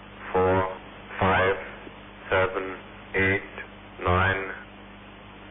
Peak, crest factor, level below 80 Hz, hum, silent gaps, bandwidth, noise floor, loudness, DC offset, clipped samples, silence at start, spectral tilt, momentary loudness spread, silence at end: -10 dBFS; 16 dB; -48 dBFS; 50 Hz at -50 dBFS; none; 3.9 kHz; -45 dBFS; -25 LUFS; under 0.1%; under 0.1%; 0 s; -10 dB/octave; 21 LU; 0 s